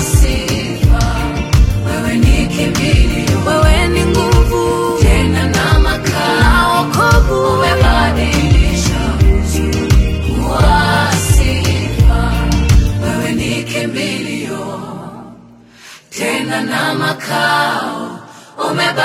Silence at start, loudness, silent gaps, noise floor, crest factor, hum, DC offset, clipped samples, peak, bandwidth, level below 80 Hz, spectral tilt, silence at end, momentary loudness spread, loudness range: 0 s; -13 LUFS; none; -40 dBFS; 12 dB; none; under 0.1%; under 0.1%; 0 dBFS; 16 kHz; -16 dBFS; -5 dB/octave; 0 s; 9 LU; 7 LU